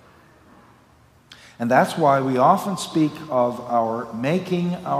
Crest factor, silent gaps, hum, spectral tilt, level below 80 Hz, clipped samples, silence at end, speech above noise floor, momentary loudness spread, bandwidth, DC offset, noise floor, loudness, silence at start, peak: 20 dB; none; none; -6 dB/octave; -64 dBFS; under 0.1%; 0 s; 34 dB; 7 LU; 16 kHz; under 0.1%; -54 dBFS; -21 LUFS; 1.3 s; -2 dBFS